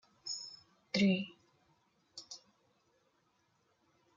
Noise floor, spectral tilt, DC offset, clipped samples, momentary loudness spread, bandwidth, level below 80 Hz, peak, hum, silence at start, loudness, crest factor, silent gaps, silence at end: -76 dBFS; -5 dB/octave; under 0.1%; under 0.1%; 22 LU; 7.6 kHz; -80 dBFS; -18 dBFS; none; 0.25 s; -35 LUFS; 22 dB; none; 1.8 s